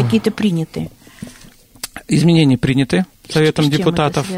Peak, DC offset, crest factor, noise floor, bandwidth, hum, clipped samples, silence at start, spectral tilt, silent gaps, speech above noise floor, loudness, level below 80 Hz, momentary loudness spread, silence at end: -2 dBFS; under 0.1%; 14 dB; -43 dBFS; 16 kHz; none; under 0.1%; 0 s; -6 dB/octave; none; 29 dB; -15 LUFS; -44 dBFS; 19 LU; 0 s